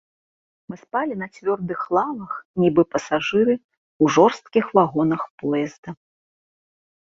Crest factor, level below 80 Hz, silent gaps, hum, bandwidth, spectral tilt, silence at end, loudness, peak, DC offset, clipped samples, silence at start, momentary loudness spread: 20 dB; -60 dBFS; 2.45-2.54 s, 3.64-3.69 s, 3.77-4.00 s, 5.30-5.38 s, 5.78-5.83 s; none; 7.6 kHz; -6 dB/octave; 1.05 s; -21 LUFS; -2 dBFS; under 0.1%; under 0.1%; 0.7 s; 12 LU